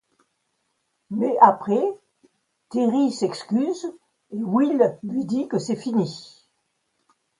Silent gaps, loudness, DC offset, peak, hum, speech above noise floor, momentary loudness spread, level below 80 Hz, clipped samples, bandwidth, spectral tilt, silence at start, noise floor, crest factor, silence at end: none; -22 LUFS; under 0.1%; 0 dBFS; none; 52 dB; 16 LU; -72 dBFS; under 0.1%; 11 kHz; -6.5 dB/octave; 1.1 s; -73 dBFS; 24 dB; 1.1 s